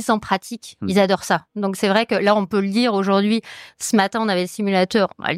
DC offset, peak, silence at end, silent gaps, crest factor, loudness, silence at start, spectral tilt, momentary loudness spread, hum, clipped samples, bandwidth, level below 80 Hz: under 0.1%; -4 dBFS; 0 s; none; 16 dB; -19 LUFS; 0 s; -5 dB/octave; 7 LU; none; under 0.1%; 15.5 kHz; -60 dBFS